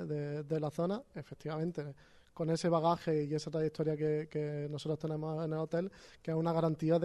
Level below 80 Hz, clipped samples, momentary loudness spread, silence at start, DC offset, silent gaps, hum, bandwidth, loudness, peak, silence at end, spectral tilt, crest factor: -70 dBFS; under 0.1%; 10 LU; 0 s; under 0.1%; none; none; 11.5 kHz; -36 LUFS; -18 dBFS; 0 s; -7.5 dB/octave; 16 dB